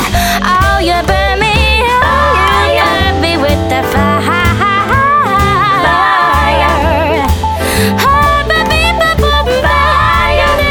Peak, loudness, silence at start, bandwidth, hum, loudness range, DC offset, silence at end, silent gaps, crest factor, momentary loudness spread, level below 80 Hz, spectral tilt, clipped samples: 0 dBFS; -9 LUFS; 0 s; 19.5 kHz; none; 1 LU; under 0.1%; 0 s; none; 10 dB; 3 LU; -18 dBFS; -4.5 dB/octave; under 0.1%